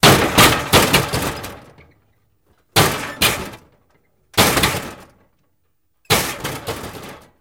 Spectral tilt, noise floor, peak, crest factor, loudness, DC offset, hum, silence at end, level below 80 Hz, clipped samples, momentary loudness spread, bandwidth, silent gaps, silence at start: -3 dB/octave; -70 dBFS; 0 dBFS; 18 dB; -16 LUFS; under 0.1%; none; 0.2 s; -38 dBFS; under 0.1%; 22 LU; 17 kHz; none; 0.05 s